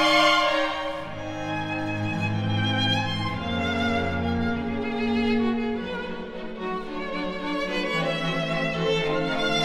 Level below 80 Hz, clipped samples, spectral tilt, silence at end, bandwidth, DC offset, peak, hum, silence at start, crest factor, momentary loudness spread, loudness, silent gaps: -48 dBFS; under 0.1%; -5.5 dB/octave; 0 s; 15.5 kHz; under 0.1%; -6 dBFS; none; 0 s; 18 dB; 9 LU; -26 LUFS; none